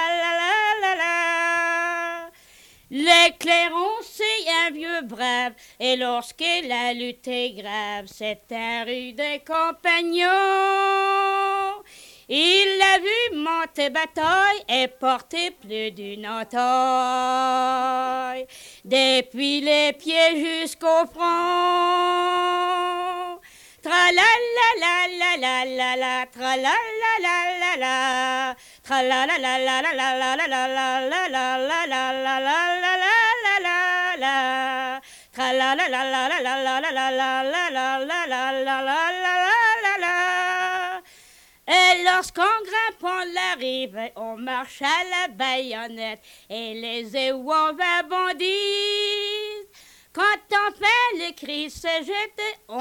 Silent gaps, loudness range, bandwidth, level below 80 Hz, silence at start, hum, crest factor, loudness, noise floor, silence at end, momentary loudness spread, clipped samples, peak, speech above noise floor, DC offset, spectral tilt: none; 5 LU; 19 kHz; -64 dBFS; 0 s; none; 18 dB; -21 LUFS; -52 dBFS; 0 s; 12 LU; under 0.1%; -4 dBFS; 30 dB; under 0.1%; -1 dB/octave